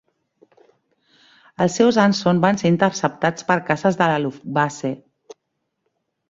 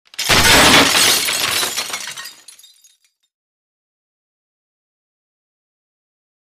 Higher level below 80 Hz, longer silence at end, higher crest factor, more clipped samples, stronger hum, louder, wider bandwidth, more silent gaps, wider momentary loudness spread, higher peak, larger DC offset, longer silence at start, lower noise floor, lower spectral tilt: second, -60 dBFS vs -40 dBFS; second, 1.35 s vs 4.1 s; about the same, 20 dB vs 18 dB; neither; neither; second, -19 LUFS vs -11 LUFS; second, 7.8 kHz vs 15.5 kHz; neither; second, 8 LU vs 17 LU; about the same, -2 dBFS vs 0 dBFS; neither; first, 1.6 s vs 0.2 s; first, -76 dBFS vs -56 dBFS; first, -5.5 dB/octave vs -1 dB/octave